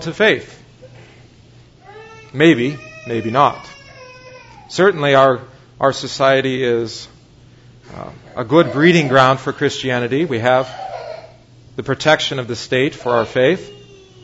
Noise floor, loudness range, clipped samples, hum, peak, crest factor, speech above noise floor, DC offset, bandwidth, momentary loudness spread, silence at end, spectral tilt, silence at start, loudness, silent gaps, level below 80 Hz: -45 dBFS; 4 LU; under 0.1%; none; 0 dBFS; 18 dB; 30 dB; under 0.1%; 8 kHz; 19 LU; 0.45 s; -5.5 dB/octave; 0 s; -16 LUFS; none; -54 dBFS